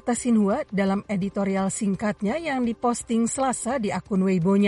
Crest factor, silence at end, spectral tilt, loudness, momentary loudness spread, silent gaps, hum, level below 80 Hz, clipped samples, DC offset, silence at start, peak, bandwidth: 12 dB; 0 s; -6 dB/octave; -24 LUFS; 5 LU; none; none; -54 dBFS; under 0.1%; under 0.1%; 0.05 s; -12 dBFS; 11.5 kHz